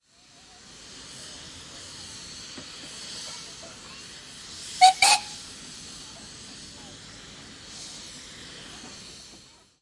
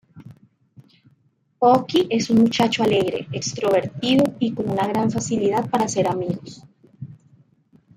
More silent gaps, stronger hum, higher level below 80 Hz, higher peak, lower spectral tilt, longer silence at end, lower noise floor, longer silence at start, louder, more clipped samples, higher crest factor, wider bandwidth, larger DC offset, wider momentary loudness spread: neither; neither; about the same, -62 dBFS vs -58 dBFS; about the same, -4 dBFS vs -4 dBFS; second, 0 dB/octave vs -5 dB/octave; second, 0.25 s vs 0.8 s; second, -55 dBFS vs -63 dBFS; about the same, 0.25 s vs 0.15 s; second, -25 LUFS vs -20 LUFS; neither; first, 28 dB vs 18 dB; second, 11.5 kHz vs 15.5 kHz; neither; first, 24 LU vs 12 LU